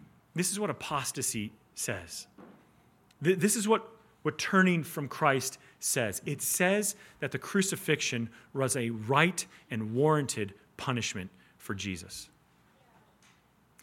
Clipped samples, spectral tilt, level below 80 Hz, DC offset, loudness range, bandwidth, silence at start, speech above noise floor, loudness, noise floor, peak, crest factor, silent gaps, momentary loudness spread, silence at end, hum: under 0.1%; -4 dB/octave; -70 dBFS; under 0.1%; 5 LU; 17 kHz; 0 s; 34 dB; -31 LUFS; -65 dBFS; -8 dBFS; 24 dB; none; 14 LU; 1.55 s; none